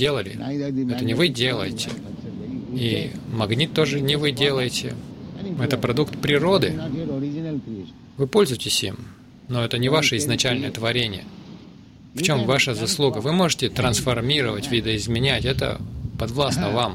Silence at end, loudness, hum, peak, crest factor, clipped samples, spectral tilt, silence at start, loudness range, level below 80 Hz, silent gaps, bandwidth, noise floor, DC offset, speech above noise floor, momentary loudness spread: 0 s; -22 LUFS; none; -4 dBFS; 18 dB; under 0.1%; -4.5 dB/octave; 0 s; 3 LU; -44 dBFS; none; 16.5 kHz; -45 dBFS; under 0.1%; 23 dB; 13 LU